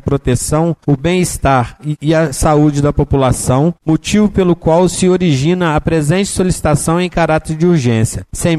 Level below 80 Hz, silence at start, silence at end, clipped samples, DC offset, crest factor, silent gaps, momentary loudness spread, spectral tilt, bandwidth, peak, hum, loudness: -28 dBFS; 0.05 s; 0 s; under 0.1%; 0.1%; 12 dB; none; 3 LU; -6 dB/octave; 13.5 kHz; -2 dBFS; none; -13 LUFS